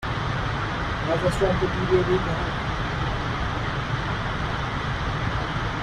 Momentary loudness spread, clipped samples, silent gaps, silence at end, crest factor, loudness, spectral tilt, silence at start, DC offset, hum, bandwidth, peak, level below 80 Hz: 5 LU; under 0.1%; none; 0 s; 16 dB; -25 LUFS; -6 dB/octave; 0 s; under 0.1%; none; 12.5 kHz; -8 dBFS; -34 dBFS